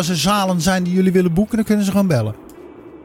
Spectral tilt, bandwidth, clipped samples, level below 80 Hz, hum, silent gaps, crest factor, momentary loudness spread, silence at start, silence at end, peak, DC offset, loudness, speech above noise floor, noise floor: -5.5 dB/octave; 16.5 kHz; under 0.1%; -42 dBFS; none; none; 16 dB; 4 LU; 0 s; 0 s; -2 dBFS; under 0.1%; -17 LUFS; 22 dB; -38 dBFS